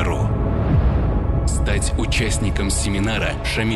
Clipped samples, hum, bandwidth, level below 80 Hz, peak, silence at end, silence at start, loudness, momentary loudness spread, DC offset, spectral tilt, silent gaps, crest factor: under 0.1%; none; 12.5 kHz; -22 dBFS; -8 dBFS; 0 s; 0 s; -20 LUFS; 3 LU; under 0.1%; -5 dB/octave; none; 10 dB